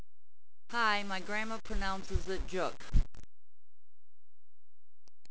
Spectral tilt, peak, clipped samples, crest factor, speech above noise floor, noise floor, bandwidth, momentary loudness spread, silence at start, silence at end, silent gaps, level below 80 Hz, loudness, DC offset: -4.5 dB/octave; -12 dBFS; under 0.1%; 22 dB; over 58 dB; under -90 dBFS; 8 kHz; 8 LU; 0 s; 0 s; none; -42 dBFS; -36 LUFS; 2%